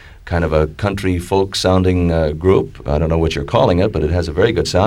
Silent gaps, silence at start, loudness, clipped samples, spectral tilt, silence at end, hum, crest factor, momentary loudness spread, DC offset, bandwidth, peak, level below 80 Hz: none; 0.05 s; -16 LUFS; under 0.1%; -6.5 dB/octave; 0 s; none; 14 dB; 5 LU; under 0.1%; 13.5 kHz; 0 dBFS; -28 dBFS